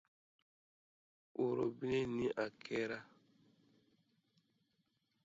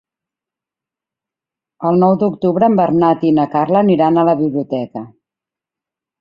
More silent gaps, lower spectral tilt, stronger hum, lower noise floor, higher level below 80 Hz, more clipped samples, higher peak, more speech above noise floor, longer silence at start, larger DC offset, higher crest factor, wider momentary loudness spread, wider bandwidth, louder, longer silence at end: neither; second, -5 dB/octave vs -10.5 dB/octave; neither; second, -82 dBFS vs -87 dBFS; second, -74 dBFS vs -56 dBFS; neither; second, -26 dBFS vs -2 dBFS; second, 43 dB vs 74 dB; second, 1.35 s vs 1.8 s; neither; about the same, 18 dB vs 14 dB; second, 7 LU vs 10 LU; first, 7.6 kHz vs 5.2 kHz; second, -40 LUFS vs -14 LUFS; first, 2.2 s vs 1.1 s